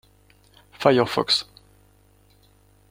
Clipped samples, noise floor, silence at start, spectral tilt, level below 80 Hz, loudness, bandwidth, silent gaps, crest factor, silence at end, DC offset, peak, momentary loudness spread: under 0.1%; -57 dBFS; 0.8 s; -4.5 dB/octave; -60 dBFS; -21 LUFS; 16 kHz; none; 24 dB; 1.5 s; under 0.1%; -2 dBFS; 6 LU